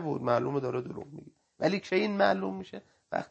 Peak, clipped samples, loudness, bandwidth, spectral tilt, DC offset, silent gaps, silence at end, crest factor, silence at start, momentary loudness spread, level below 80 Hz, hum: -10 dBFS; under 0.1%; -30 LUFS; 8.4 kHz; -6.5 dB/octave; under 0.1%; none; 0.05 s; 20 dB; 0 s; 19 LU; -70 dBFS; none